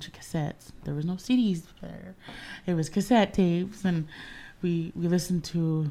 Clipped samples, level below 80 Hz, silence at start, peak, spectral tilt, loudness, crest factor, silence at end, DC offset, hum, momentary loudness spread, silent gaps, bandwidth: under 0.1%; -52 dBFS; 0 s; -10 dBFS; -6.5 dB/octave; -28 LUFS; 18 dB; 0 s; under 0.1%; none; 19 LU; none; 15 kHz